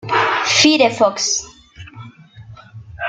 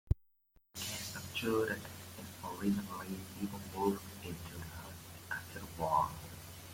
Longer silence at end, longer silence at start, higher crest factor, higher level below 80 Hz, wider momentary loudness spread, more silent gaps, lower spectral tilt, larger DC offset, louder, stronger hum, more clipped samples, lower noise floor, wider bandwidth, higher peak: about the same, 0 s vs 0 s; about the same, 0.05 s vs 0.05 s; about the same, 18 dB vs 22 dB; about the same, -52 dBFS vs -52 dBFS; first, 18 LU vs 14 LU; neither; second, -2 dB/octave vs -5 dB/octave; neither; first, -14 LUFS vs -40 LUFS; neither; neither; second, -40 dBFS vs -71 dBFS; second, 9.4 kHz vs 16.5 kHz; first, 0 dBFS vs -18 dBFS